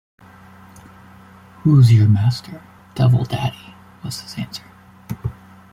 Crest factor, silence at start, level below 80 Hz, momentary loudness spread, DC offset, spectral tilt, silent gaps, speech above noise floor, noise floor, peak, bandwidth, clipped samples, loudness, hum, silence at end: 16 dB; 1.65 s; -48 dBFS; 23 LU; under 0.1%; -7.5 dB/octave; none; 28 dB; -44 dBFS; -4 dBFS; 14 kHz; under 0.1%; -17 LUFS; none; 0.4 s